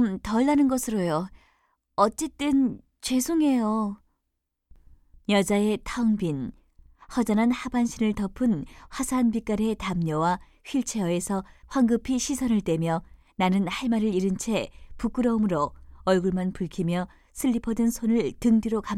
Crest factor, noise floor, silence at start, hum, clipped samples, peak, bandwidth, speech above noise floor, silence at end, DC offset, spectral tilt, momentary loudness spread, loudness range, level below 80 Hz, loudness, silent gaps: 18 dB; -80 dBFS; 0 s; none; under 0.1%; -8 dBFS; 15.5 kHz; 55 dB; 0 s; under 0.1%; -5.5 dB/octave; 9 LU; 2 LU; -48 dBFS; -26 LUFS; none